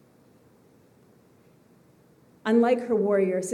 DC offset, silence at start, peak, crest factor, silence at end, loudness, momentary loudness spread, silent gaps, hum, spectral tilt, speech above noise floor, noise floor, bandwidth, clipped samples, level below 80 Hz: under 0.1%; 2.45 s; -10 dBFS; 18 dB; 0 s; -24 LUFS; 3 LU; none; none; -6 dB/octave; 36 dB; -58 dBFS; 12 kHz; under 0.1%; -78 dBFS